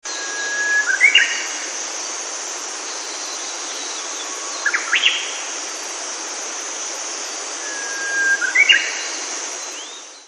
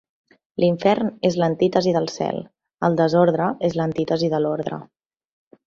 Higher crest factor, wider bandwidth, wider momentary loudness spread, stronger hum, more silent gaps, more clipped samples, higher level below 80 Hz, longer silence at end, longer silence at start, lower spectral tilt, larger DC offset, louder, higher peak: about the same, 22 dB vs 18 dB; first, 14.5 kHz vs 7.4 kHz; first, 13 LU vs 9 LU; neither; neither; neither; second, under -90 dBFS vs -60 dBFS; second, 0 s vs 0.85 s; second, 0.05 s vs 0.6 s; second, 4.5 dB/octave vs -7 dB/octave; neither; about the same, -19 LUFS vs -21 LUFS; first, 0 dBFS vs -4 dBFS